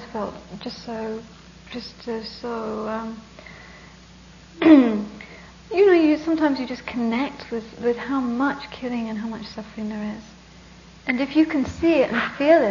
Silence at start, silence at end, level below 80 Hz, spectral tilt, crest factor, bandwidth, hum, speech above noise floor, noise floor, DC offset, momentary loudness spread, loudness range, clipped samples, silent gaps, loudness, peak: 0 s; 0 s; -52 dBFS; -6 dB/octave; 20 dB; 7.4 kHz; none; 25 dB; -46 dBFS; under 0.1%; 19 LU; 12 LU; under 0.1%; none; -22 LUFS; -2 dBFS